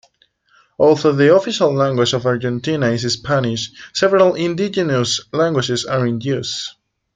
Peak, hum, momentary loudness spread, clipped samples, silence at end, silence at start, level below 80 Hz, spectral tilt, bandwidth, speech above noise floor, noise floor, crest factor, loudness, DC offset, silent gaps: -2 dBFS; none; 8 LU; under 0.1%; 0.45 s; 0.8 s; -54 dBFS; -5 dB/octave; 9.4 kHz; 42 dB; -58 dBFS; 16 dB; -17 LUFS; under 0.1%; none